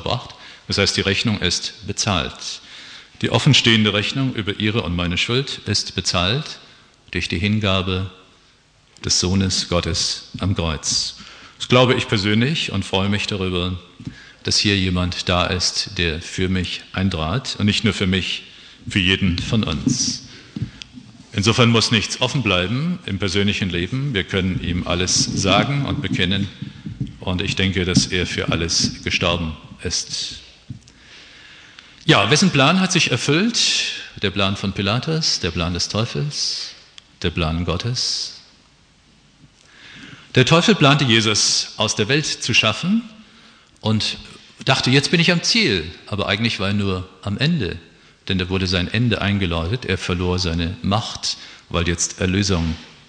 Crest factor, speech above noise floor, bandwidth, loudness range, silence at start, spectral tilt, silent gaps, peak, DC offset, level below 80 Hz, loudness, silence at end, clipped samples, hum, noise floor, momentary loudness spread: 20 dB; 35 dB; 10.5 kHz; 5 LU; 0 s; -4 dB/octave; none; 0 dBFS; under 0.1%; -42 dBFS; -19 LUFS; 0.15 s; under 0.1%; none; -54 dBFS; 14 LU